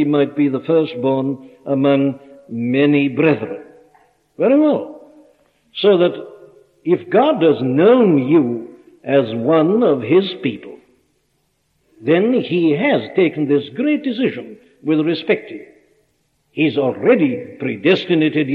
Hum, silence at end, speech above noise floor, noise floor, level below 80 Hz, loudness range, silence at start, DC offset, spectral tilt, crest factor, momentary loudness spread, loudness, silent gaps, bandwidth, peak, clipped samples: none; 0 s; 49 dB; -65 dBFS; -68 dBFS; 4 LU; 0 s; under 0.1%; -9 dB/octave; 16 dB; 15 LU; -16 LUFS; none; 5 kHz; 0 dBFS; under 0.1%